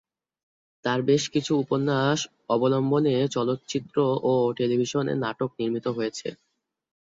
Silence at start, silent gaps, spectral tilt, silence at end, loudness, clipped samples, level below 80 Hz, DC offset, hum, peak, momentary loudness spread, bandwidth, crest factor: 0.85 s; none; -5.5 dB/octave; 0.7 s; -25 LUFS; under 0.1%; -66 dBFS; under 0.1%; none; -8 dBFS; 7 LU; 7.8 kHz; 16 dB